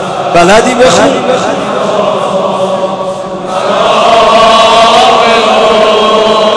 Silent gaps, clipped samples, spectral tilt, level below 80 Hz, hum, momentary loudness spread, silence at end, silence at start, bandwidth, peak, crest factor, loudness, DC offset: none; 2%; -3.5 dB/octave; -36 dBFS; none; 9 LU; 0 s; 0 s; 11 kHz; 0 dBFS; 6 dB; -6 LUFS; under 0.1%